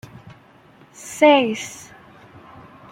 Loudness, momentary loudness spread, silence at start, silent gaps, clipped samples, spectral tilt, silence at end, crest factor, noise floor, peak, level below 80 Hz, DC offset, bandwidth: -17 LUFS; 25 LU; 1.05 s; none; under 0.1%; -3.5 dB/octave; 1.15 s; 20 dB; -50 dBFS; -2 dBFS; -64 dBFS; under 0.1%; 16 kHz